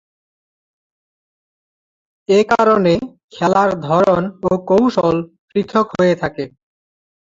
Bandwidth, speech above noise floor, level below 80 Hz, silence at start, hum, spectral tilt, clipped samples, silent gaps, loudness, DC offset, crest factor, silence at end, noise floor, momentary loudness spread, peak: 7.8 kHz; over 75 dB; -50 dBFS; 2.3 s; none; -7 dB/octave; under 0.1%; 3.23-3.28 s, 5.39-5.48 s; -16 LUFS; under 0.1%; 16 dB; 0.9 s; under -90 dBFS; 11 LU; -2 dBFS